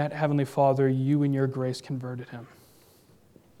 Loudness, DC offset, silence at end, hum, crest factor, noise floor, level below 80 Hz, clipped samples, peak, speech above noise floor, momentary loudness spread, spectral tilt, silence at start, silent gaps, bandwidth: -26 LUFS; under 0.1%; 1.15 s; none; 16 dB; -58 dBFS; -72 dBFS; under 0.1%; -10 dBFS; 32 dB; 16 LU; -8 dB/octave; 0 s; none; 13 kHz